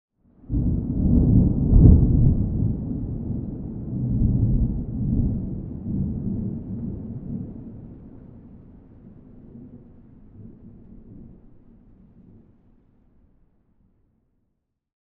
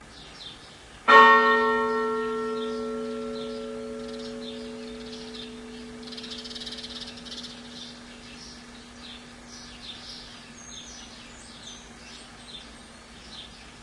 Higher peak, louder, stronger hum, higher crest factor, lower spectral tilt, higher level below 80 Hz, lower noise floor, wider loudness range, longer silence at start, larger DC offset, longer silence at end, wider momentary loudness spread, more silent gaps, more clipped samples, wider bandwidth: about the same, 0 dBFS vs 0 dBFS; about the same, -23 LUFS vs -23 LUFS; neither; about the same, 24 dB vs 28 dB; first, -16.5 dB/octave vs -3 dB/octave; first, -28 dBFS vs -56 dBFS; first, -75 dBFS vs -47 dBFS; about the same, 21 LU vs 20 LU; first, 0.5 s vs 0 s; neither; first, 3.65 s vs 0 s; first, 26 LU vs 22 LU; neither; neither; second, 1.5 kHz vs 11.5 kHz